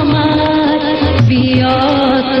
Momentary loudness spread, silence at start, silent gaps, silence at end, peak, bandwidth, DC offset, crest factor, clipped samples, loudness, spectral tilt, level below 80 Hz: 2 LU; 0 s; none; 0 s; 0 dBFS; 6.2 kHz; under 0.1%; 10 dB; under 0.1%; -12 LUFS; -8 dB/octave; -32 dBFS